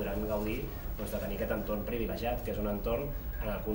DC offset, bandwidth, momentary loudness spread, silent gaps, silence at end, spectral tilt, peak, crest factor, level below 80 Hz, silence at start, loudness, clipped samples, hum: under 0.1%; 16 kHz; 4 LU; none; 0 s; -7 dB/octave; -20 dBFS; 14 dB; -40 dBFS; 0 s; -35 LUFS; under 0.1%; none